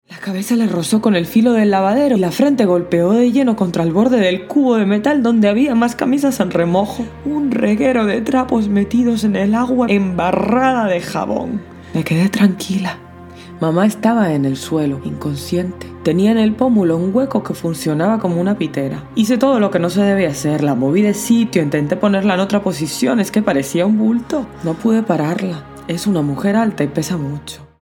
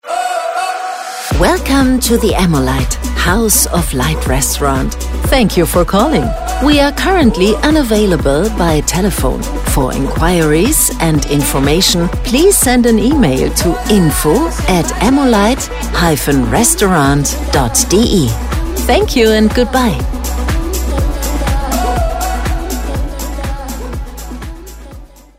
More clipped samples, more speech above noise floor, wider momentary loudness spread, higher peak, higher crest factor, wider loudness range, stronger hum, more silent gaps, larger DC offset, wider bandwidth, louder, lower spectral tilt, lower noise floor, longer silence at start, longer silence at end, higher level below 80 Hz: neither; about the same, 21 dB vs 23 dB; about the same, 8 LU vs 9 LU; about the same, 0 dBFS vs 0 dBFS; about the same, 16 dB vs 12 dB; about the same, 4 LU vs 6 LU; neither; neither; neither; about the same, 18 kHz vs 16.5 kHz; second, -16 LUFS vs -12 LUFS; first, -6.5 dB/octave vs -4.5 dB/octave; about the same, -36 dBFS vs -33 dBFS; about the same, 0.1 s vs 0.05 s; about the same, 0.2 s vs 0.3 s; second, -46 dBFS vs -20 dBFS